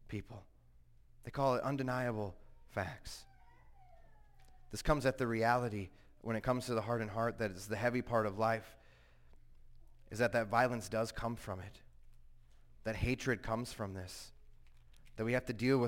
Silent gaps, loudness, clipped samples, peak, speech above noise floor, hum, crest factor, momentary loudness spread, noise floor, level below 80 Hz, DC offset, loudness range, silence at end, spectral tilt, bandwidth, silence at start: none; -37 LUFS; under 0.1%; -16 dBFS; 26 dB; none; 22 dB; 16 LU; -63 dBFS; -54 dBFS; under 0.1%; 5 LU; 0 s; -6 dB/octave; 16.5 kHz; 0.05 s